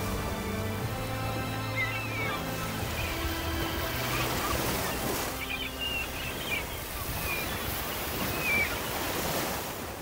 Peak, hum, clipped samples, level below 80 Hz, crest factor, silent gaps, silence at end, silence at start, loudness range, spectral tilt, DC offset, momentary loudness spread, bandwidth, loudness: -16 dBFS; none; under 0.1%; -42 dBFS; 16 dB; none; 0 s; 0 s; 2 LU; -3.5 dB/octave; under 0.1%; 4 LU; 16.5 kHz; -31 LUFS